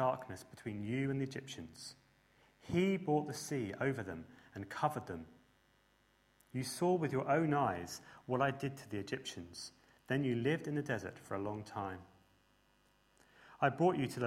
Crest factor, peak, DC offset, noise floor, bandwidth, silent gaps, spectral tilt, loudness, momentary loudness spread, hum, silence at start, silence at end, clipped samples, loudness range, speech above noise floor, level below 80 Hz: 22 dB; -18 dBFS; under 0.1%; -72 dBFS; 16 kHz; none; -6 dB/octave; -38 LUFS; 16 LU; 50 Hz at -65 dBFS; 0 s; 0 s; under 0.1%; 5 LU; 35 dB; -70 dBFS